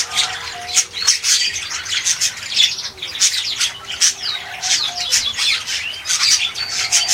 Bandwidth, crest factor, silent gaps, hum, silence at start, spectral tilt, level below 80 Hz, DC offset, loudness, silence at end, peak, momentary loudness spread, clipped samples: 17 kHz; 18 dB; none; none; 0 s; 2.5 dB/octave; -54 dBFS; under 0.1%; -16 LUFS; 0 s; 0 dBFS; 8 LU; under 0.1%